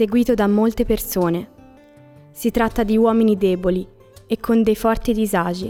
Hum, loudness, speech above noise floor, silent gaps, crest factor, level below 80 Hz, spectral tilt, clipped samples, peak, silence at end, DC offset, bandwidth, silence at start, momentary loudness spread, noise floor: none; -19 LUFS; 28 dB; none; 14 dB; -36 dBFS; -6 dB/octave; under 0.1%; -6 dBFS; 0 s; under 0.1%; 18 kHz; 0 s; 9 LU; -46 dBFS